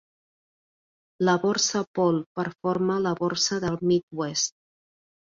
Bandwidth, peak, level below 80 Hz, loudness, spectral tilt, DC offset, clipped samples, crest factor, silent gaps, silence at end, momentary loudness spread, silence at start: 7.6 kHz; -8 dBFS; -62 dBFS; -25 LUFS; -4 dB/octave; under 0.1%; under 0.1%; 18 dB; 1.87-1.94 s, 2.26-2.35 s, 4.03-4.08 s; 0.75 s; 6 LU; 1.2 s